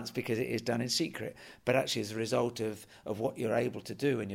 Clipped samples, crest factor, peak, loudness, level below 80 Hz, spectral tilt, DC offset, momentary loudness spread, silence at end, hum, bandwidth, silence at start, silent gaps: under 0.1%; 20 dB; -14 dBFS; -33 LUFS; -70 dBFS; -4.5 dB/octave; under 0.1%; 8 LU; 0 s; none; 16 kHz; 0 s; none